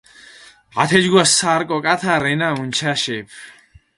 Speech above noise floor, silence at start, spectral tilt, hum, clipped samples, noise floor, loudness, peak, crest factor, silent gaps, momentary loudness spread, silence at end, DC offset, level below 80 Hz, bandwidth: 27 dB; 0.75 s; -3 dB/octave; none; under 0.1%; -45 dBFS; -16 LUFS; 0 dBFS; 18 dB; none; 12 LU; 0.45 s; under 0.1%; -56 dBFS; 11.5 kHz